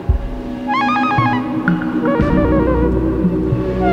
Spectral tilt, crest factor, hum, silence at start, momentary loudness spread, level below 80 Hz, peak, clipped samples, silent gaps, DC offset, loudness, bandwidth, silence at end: -8.5 dB/octave; 14 dB; none; 0 s; 6 LU; -24 dBFS; 0 dBFS; under 0.1%; none; under 0.1%; -16 LUFS; 7.8 kHz; 0 s